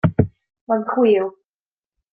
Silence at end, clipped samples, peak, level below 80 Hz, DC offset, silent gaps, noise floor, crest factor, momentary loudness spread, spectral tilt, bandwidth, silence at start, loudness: 0.85 s; under 0.1%; -2 dBFS; -48 dBFS; under 0.1%; 0.61-0.67 s; under -90 dBFS; 18 dB; 8 LU; -12 dB/octave; 4.6 kHz; 0.05 s; -20 LUFS